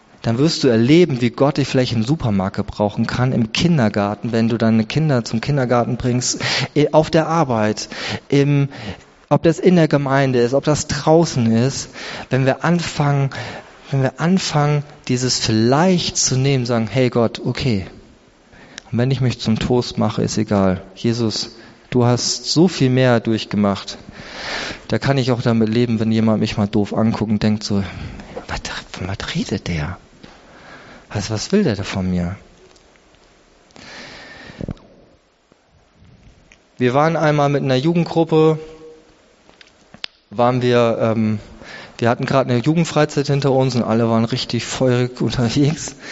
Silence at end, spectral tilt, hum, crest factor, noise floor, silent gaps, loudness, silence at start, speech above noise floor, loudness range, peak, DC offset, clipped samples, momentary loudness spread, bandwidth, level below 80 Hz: 0 s; -5.5 dB/octave; none; 16 dB; -56 dBFS; none; -18 LUFS; 0.25 s; 39 dB; 7 LU; -2 dBFS; under 0.1%; under 0.1%; 14 LU; 8 kHz; -44 dBFS